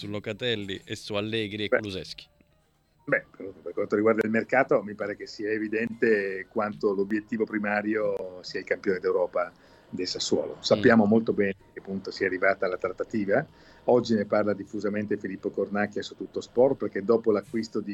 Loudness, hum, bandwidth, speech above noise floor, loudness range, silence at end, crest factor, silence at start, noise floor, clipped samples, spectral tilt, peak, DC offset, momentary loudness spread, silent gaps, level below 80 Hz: -27 LUFS; none; 11 kHz; 39 dB; 4 LU; 0 s; 20 dB; 0 s; -66 dBFS; under 0.1%; -5.5 dB/octave; -6 dBFS; under 0.1%; 12 LU; none; -64 dBFS